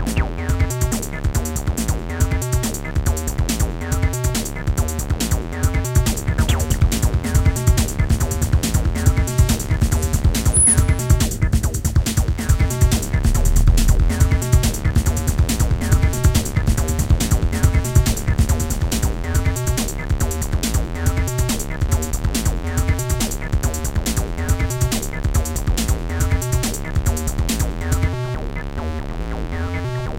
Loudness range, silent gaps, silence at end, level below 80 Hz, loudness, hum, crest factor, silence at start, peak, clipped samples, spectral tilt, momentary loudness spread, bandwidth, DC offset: 5 LU; none; 0 s; -22 dBFS; -20 LUFS; none; 18 dB; 0 s; 0 dBFS; under 0.1%; -5 dB/octave; 5 LU; 17 kHz; under 0.1%